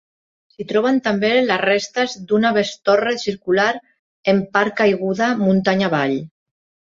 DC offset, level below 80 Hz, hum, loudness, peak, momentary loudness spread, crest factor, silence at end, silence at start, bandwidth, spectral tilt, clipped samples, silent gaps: under 0.1%; -60 dBFS; none; -18 LUFS; -2 dBFS; 6 LU; 18 dB; 0.6 s; 0.6 s; 7.6 kHz; -5.5 dB/octave; under 0.1%; 3.99-4.23 s